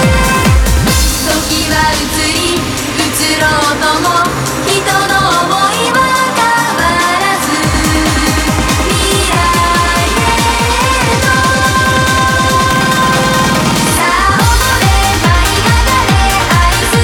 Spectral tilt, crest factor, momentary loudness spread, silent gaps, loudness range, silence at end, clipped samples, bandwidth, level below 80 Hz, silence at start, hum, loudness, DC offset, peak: -3.5 dB/octave; 10 dB; 2 LU; none; 2 LU; 0 s; under 0.1%; 20 kHz; -20 dBFS; 0 s; none; -10 LUFS; under 0.1%; 0 dBFS